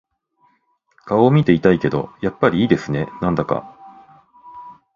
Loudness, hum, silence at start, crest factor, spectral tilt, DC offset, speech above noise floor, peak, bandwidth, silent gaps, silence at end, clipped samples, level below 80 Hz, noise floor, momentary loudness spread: -18 LUFS; none; 1.05 s; 20 dB; -8.5 dB/octave; under 0.1%; 47 dB; 0 dBFS; 7.2 kHz; none; 0.2 s; under 0.1%; -48 dBFS; -64 dBFS; 11 LU